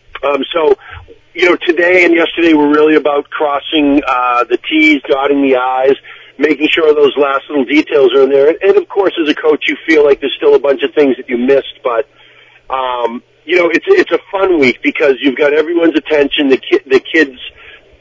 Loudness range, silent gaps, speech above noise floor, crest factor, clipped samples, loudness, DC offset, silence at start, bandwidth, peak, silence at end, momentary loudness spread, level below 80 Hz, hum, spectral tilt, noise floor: 3 LU; none; 32 dB; 12 dB; 0.2%; -11 LUFS; under 0.1%; 0.15 s; 7.6 kHz; 0 dBFS; 0.3 s; 8 LU; -48 dBFS; none; -5 dB/octave; -42 dBFS